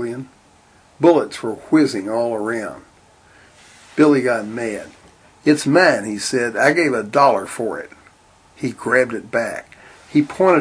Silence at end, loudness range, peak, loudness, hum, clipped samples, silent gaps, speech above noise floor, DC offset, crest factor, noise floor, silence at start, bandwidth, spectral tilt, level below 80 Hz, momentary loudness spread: 0 s; 4 LU; 0 dBFS; -18 LUFS; none; under 0.1%; none; 34 dB; under 0.1%; 18 dB; -51 dBFS; 0 s; 10.5 kHz; -5 dB/octave; -60 dBFS; 14 LU